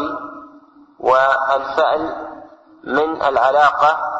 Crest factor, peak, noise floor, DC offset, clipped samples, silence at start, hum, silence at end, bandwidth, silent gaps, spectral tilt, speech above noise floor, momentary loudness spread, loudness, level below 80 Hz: 16 dB; -2 dBFS; -46 dBFS; under 0.1%; under 0.1%; 0 s; none; 0 s; 8 kHz; none; -4.5 dB/octave; 30 dB; 17 LU; -16 LUFS; -54 dBFS